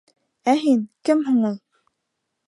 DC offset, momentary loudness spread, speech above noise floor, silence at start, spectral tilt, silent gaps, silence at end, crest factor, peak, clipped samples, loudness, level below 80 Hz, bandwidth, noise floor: under 0.1%; 8 LU; 59 dB; 0.45 s; -6 dB/octave; none; 0.9 s; 16 dB; -6 dBFS; under 0.1%; -21 LUFS; -76 dBFS; 11.5 kHz; -78 dBFS